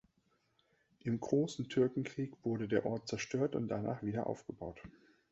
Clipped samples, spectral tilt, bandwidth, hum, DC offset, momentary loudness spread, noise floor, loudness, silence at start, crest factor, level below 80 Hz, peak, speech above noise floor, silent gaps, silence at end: under 0.1%; -6.5 dB/octave; 8 kHz; none; under 0.1%; 11 LU; -77 dBFS; -37 LUFS; 1.05 s; 20 dB; -68 dBFS; -18 dBFS; 40 dB; none; 0.4 s